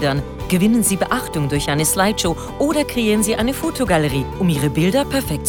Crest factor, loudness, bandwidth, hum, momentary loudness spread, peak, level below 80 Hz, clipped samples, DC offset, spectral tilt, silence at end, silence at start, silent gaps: 14 dB; -18 LUFS; 19.5 kHz; none; 5 LU; -4 dBFS; -34 dBFS; under 0.1%; under 0.1%; -4.5 dB/octave; 0 s; 0 s; none